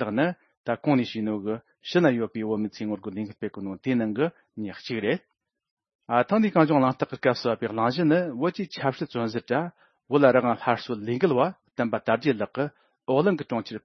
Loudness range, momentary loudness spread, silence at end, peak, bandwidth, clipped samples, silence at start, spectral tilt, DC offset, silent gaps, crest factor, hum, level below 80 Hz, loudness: 5 LU; 12 LU; 0.05 s; -4 dBFS; 6.4 kHz; under 0.1%; 0 s; -7.5 dB/octave; under 0.1%; 0.57-0.64 s, 5.71-5.77 s, 5.95-5.99 s; 22 dB; none; -70 dBFS; -26 LUFS